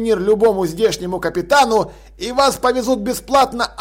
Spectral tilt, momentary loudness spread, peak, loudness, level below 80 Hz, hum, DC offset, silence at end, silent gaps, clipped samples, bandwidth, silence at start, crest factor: -4 dB/octave; 8 LU; -4 dBFS; -16 LUFS; -42 dBFS; none; under 0.1%; 0 s; none; under 0.1%; 16.5 kHz; 0 s; 12 dB